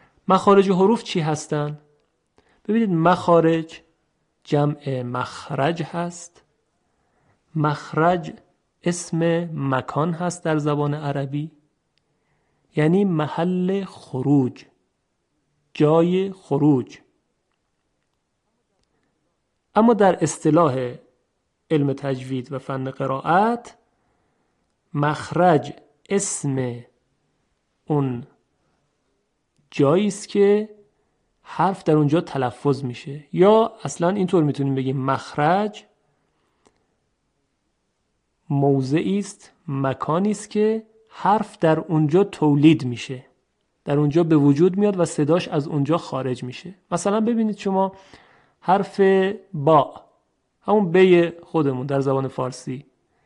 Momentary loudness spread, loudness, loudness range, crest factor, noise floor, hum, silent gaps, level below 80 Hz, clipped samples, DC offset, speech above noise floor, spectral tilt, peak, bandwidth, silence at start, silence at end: 13 LU; -21 LUFS; 7 LU; 18 dB; -73 dBFS; none; none; -64 dBFS; under 0.1%; under 0.1%; 53 dB; -6.5 dB/octave; -4 dBFS; 11 kHz; 0.3 s; 0.45 s